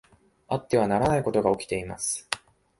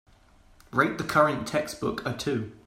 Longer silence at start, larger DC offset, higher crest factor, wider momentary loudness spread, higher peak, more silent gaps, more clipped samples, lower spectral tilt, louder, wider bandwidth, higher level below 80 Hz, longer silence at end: second, 0.5 s vs 0.75 s; neither; about the same, 24 dB vs 22 dB; about the same, 9 LU vs 8 LU; about the same, -4 dBFS vs -6 dBFS; neither; neither; about the same, -4.5 dB/octave vs -5 dB/octave; about the same, -26 LUFS vs -27 LUFS; second, 11.5 kHz vs 16 kHz; about the same, -52 dBFS vs -56 dBFS; first, 0.4 s vs 0.1 s